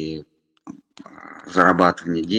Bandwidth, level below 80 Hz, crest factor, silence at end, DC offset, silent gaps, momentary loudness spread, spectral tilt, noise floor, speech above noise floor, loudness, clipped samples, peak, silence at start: 9.8 kHz; -56 dBFS; 22 dB; 0 s; under 0.1%; none; 25 LU; -6 dB/octave; -44 dBFS; 25 dB; -18 LUFS; under 0.1%; 0 dBFS; 0 s